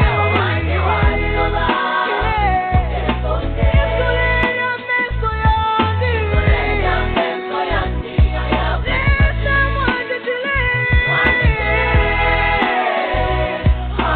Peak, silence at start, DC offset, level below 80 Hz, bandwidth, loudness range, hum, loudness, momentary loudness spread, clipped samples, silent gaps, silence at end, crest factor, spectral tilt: -2 dBFS; 0 s; under 0.1%; -22 dBFS; 4.5 kHz; 2 LU; none; -17 LUFS; 5 LU; under 0.1%; none; 0 s; 14 dB; -4 dB/octave